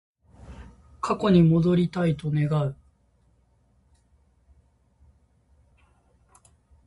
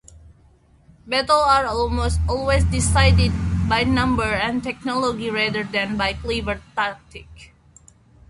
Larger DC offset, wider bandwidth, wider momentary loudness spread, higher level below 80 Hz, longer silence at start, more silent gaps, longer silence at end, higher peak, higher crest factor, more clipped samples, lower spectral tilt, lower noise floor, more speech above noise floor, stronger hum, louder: neither; about the same, 10.5 kHz vs 11.5 kHz; first, 25 LU vs 9 LU; second, -52 dBFS vs -28 dBFS; first, 0.5 s vs 0.15 s; neither; first, 4.15 s vs 0.85 s; second, -8 dBFS vs -2 dBFS; about the same, 20 dB vs 18 dB; neither; first, -8.5 dB/octave vs -5 dB/octave; first, -64 dBFS vs -54 dBFS; first, 42 dB vs 34 dB; neither; second, -23 LUFS vs -20 LUFS